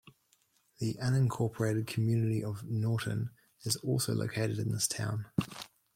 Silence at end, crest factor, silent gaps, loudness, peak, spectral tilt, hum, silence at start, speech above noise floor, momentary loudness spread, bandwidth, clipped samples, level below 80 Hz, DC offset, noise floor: 0.3 s; 18 dB; none; -33 LUFS; -14 dBFS; -5.5 dB/octave; none; 0.05 s; 40 dB; 8 LU; 16.5 kHz; under 0.1%; -64 dBFS; under 0.1%; -72 dBFS